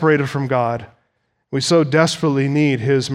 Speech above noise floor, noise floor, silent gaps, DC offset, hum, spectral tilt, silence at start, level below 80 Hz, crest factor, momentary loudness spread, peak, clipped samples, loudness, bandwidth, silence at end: 52 dB; -68 dBFS; none; under 0.1%; none; -5.5 dB/octave; 0 s; -60 dBFS; 18 dB; 8 LU; 0 dBFS; under 0.1%; -17 LUFS; 14 kHz; 0 s